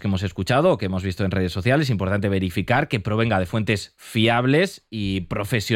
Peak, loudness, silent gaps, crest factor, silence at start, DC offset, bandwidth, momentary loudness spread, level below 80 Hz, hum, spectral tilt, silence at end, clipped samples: -6 dBFS; -22 LUFS; none; 16 dB; 0 s; under 0.1%; 16 kHz; 7 LU; -46 dBFS; none; -6 dB/octave; 0 s; under 0.1%